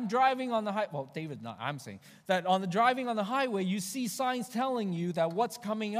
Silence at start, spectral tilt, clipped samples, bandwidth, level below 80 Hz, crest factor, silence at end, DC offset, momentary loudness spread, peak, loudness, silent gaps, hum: 0 s; -5 dB/octave; under 0.1%; 15.5 kHz; -82 dBFS; 20 dB; 0 s; under 0.1%; 12 LU; -12 dBFS; -31 LUFS; none; none